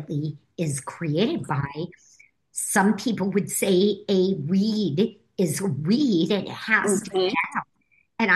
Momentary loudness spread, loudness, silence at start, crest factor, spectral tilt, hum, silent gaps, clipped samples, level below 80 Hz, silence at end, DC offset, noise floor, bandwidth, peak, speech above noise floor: 10 LU; -24 LUFS; 0 s; 18 dB; -5 dB/octave; none; none; under 0.1%; -64 dBFS; 0 s; under 0.1%; -66 dBFS; 12.5 kHz; -6 dBFS; 42 dB